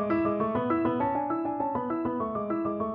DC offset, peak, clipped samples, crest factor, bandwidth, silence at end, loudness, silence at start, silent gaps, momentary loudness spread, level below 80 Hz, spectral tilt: under 0.1%; -16 dBFS; under 0.1%; 12 dB; 4.7 kHz; 0 s; -29 LUFS; 0 s; none; 4 LU; -58 dBFS; -10.5 dB/octave